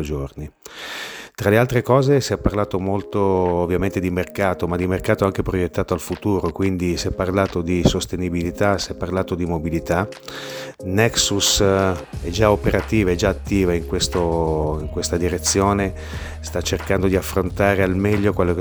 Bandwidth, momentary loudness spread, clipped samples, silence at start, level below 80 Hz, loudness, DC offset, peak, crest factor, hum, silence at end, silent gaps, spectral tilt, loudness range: over 20 kHz; 11 LU; under 0.1%; 0 s; -34 dBFS; -20 LUFS; under 0.1%; 0 dBFS; 20 dB; none; 0 s; none; -5 dB/octave; 3 LU